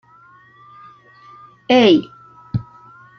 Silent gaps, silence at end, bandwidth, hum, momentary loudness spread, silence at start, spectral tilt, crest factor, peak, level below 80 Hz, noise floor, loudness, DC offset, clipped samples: none; 0.55 s; 6.6 kHz; none; 26 LU; 1.7 s; -6.5 dB/octave; 18 dB; -2 dBFS; -54 dBFS; -48 dBFS; -16 LUFS; under 0.1%; under 0.1%